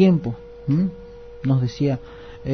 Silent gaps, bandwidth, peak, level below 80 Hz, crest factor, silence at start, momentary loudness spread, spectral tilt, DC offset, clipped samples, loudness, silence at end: none; 6.4 kHz; -4 dBFS; -46 dBFS; 18 dB; 0 s; 19 LU; -9 dB/octave; under 0.1%; under 0.1%; -23 LUFS; 0 s